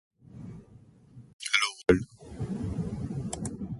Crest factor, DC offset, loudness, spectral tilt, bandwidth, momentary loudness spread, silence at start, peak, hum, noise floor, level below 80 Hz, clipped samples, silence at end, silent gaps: 26 dB; under 0.1%; -30 LUFS; -4.5 dB/octave; 11.5 kHz; 20 LU; 0.3 s; -8 dBFS; none; -55 dBFS; -48 dBFS; under 0.1%; 0 s; 1.33-1.39 s